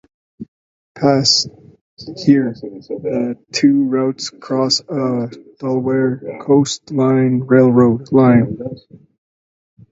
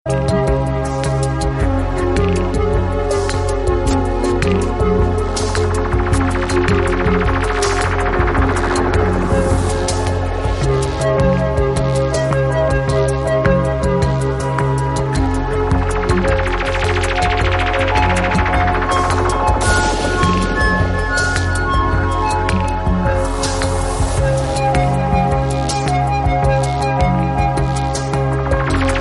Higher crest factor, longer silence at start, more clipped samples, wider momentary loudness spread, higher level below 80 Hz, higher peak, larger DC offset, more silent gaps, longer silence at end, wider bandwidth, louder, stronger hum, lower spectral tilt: about the same, 16 dB vs 14 dB; first, 0.4 s vs 0.05 s; neither; first, 16 LU vs 3 LU; second, -54 dBFS vs -22 dBFS; about the same, 0 dBFS vs -2 dBFS; neither; first, 0.48-0.95 s, 1.81-1.97 s vs none; first, 1.15 s vs 0 s; second, 7.8 kHz vs 11.5 kHz; about the same, -15 LUFS vs -16 LUFS; neither; about the same, -5.5 dB/octave vs -6 dB/octave